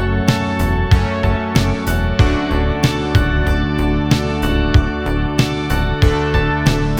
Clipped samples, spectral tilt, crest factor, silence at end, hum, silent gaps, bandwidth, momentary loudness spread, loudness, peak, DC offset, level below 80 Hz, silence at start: under 0.1%; -6 dB/octave; 14 dB; 0 s; none; none; over 20 kHz; 3 LU; -17 LUFS; 0 dBFS; under 0.1%; -20 dBFS; 0 s